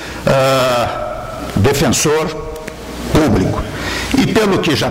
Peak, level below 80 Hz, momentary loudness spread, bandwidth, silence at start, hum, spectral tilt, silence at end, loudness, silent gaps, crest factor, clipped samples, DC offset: -4 dBFS; -32 dBFS; 13 LU; 16.5 kHz; 0 s; none; -4.5 dB/octave; 0 s; -15 LUFS; none; 10 dB; under 0.1%; under 0.1%